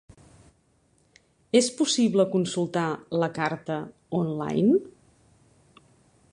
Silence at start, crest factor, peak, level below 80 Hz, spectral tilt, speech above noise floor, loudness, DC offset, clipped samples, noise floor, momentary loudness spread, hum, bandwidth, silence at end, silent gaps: 1.55 s; 20 dB; -8 dBFS; -66 dBFS; -5 dB/octave; 41 dB; -25 LUFS; under 0.1%; under 0.1%; -65 dBFS; 9 LU; none; 11.5 kHz; 1.4 s; none